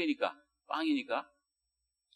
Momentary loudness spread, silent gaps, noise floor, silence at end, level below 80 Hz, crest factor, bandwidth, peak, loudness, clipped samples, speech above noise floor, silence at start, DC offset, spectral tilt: 6 LU; none; -86 dBFS; 0.9 s; -88 dBFS; 22 dB; 10.5 kHz; -16 dBFS; -35 LUFS; under 0.1%; 52 dB; 0 s; under 0.1%; -4 dB/octave